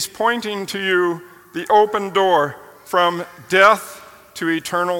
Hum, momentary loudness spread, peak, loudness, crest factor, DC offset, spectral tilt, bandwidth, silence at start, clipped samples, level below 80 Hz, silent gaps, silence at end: none; 17 LU; 0 dBFS; -18 LUFS; 18 dB; under 0.1%; -3.5 dB/octave; 17.5 kHz; 0 s; under 0.1%; -64 dBFS; none; 0 s